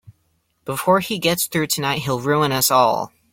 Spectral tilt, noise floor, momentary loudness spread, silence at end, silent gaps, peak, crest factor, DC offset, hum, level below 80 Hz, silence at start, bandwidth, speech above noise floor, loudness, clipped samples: -3.5 dB/octave; -66 dBFS; 9 LU; 0.25 s; none; -2 dBFS; 18 dB; under 0.1%; none; -56 dBFS; 0.65 s; 17 kHz; 47 dB; -19 LUFS; under 0.1%